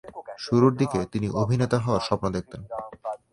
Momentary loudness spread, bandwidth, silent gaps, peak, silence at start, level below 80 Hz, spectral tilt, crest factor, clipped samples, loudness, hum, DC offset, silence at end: 15 LU; 11.5 kHz; none; -6 dBFS; 0.05 s; -50 dBFS; -7 dB/octave; 18 dB; under 0.1%; -25 LUFS; none; under 0.1%; 0.15 s